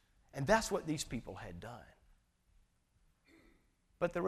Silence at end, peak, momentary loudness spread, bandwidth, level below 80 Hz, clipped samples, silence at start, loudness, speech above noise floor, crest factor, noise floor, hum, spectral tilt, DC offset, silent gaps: 0 s; -16 dBFS; 18 LU; 15 kHz; -58 dBFS; under 0.1%; 0.35 s; -37 LUFS; 37 dB; 24 dB; -74 dBFS; none; -4.5 dB/octave; under 0.1%; none